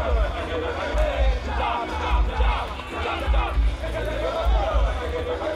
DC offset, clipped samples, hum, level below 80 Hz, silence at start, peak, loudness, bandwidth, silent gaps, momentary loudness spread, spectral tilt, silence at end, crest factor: under 0.1%; under 0.1%; none; -24 dBFS; 0 s; -10 dBFS; -25 LUFS; 10 kHz; none; 5 LU; -6 dB/octave; 0 s; 14 dB